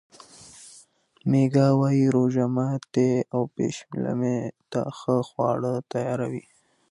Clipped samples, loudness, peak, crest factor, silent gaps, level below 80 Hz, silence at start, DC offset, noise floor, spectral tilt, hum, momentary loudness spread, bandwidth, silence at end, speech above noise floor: under 0.1%; -25 LUFS; -8 dBFS; 16 dB; none; -66 dBFS; 0.4 s; under 0.1%; -55 dBFS; -8 dB/octave; none; 12 LU; 11.5 kHz; 0.5 s; 32 dB